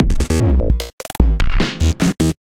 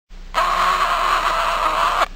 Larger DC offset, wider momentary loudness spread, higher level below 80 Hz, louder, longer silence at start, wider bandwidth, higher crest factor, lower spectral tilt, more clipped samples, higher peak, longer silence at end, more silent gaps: neither; about the same, 5 LU vs 3 LU; first, -16 dBFS vs -34 dBFS; about the same, -17 LUFS vs -18 LUFS; about the same, 0 s vs 0.1 s; about the same, 16.5 kHz vs 16.5 kHz; about the same, 14 dB vs 16 dB; first, -6 dB/octave vs -1.5 dB/octave; neither; about the same, 0 dBFS vs -2 dBFS; about the same, 0.05 s vs 0 s; first, 0.93-0.98 s vs none